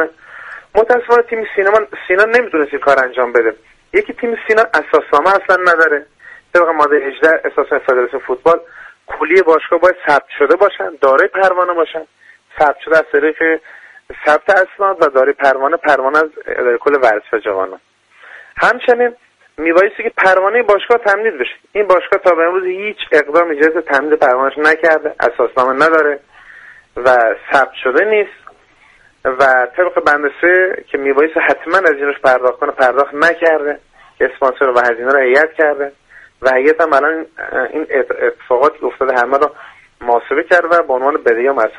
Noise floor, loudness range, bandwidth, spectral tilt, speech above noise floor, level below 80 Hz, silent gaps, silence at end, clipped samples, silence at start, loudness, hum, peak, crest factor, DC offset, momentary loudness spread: -48 dBFS; 2 LU; 11 kHz; -4.5 dB/octave; 36 dB; -52 dBFS; none; 0 s; under 0.1%; 0 s; -13 LUFS; none; 0 dBFS; 14 dB; under 0.1%; 8 LU